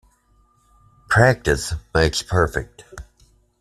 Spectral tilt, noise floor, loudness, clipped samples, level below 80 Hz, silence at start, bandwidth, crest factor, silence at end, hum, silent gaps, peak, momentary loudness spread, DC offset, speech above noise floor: -5 dB/octave; -59 dBFS; -19 LUFS; under 0.1%; -36 dBFS; 1.1 s; 13.5 kHz; 20 dB; 0.6 s; none; none; -2 dBFS; 25 LU; under 0.1%; 40 dB